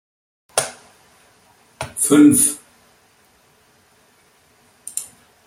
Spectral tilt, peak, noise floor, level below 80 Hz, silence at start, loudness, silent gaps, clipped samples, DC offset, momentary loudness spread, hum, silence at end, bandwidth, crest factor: -3.5 dB/octave; 0 dBFS; -56 dBFS; -60 dBFS; 0.55 s; -17 LUFS; none; under 0.1%; under 0.1%; 22 LU; none; 0.4 s; 16 kHz; 22 dB